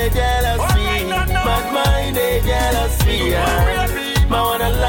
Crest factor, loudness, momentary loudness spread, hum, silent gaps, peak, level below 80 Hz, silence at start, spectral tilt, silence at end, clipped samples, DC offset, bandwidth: 10 dB; -17 LUFS; 2 LU; none; none; -6 dBFS; -20 dBFS; 0 s; -4.5 dB/octave; 0 s; under 0.1%; under 0.1%; 17 kHz